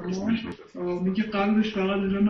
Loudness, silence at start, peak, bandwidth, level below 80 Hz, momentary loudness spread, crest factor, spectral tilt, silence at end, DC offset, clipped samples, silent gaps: -26 LUFS; 0 s; -12 dBFS; 6.6 kHz; -52 dBFS; 8 LU; 12 dB; -7.5 dB/octave; 0 s; under 0.1%; under 0.1%; none